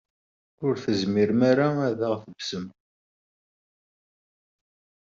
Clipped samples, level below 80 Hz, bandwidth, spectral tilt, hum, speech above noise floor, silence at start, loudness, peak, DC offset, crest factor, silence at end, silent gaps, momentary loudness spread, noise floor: under 0.1%; -68 dBFS; 7.6 kHz; -5.5 dB/octave; none; over 66 dB; 0.6 s; -25 LUFS; -6 dBFS; under 0.1%; 20 dB; 2.35 s; none; 12 LU; under -90 dBFS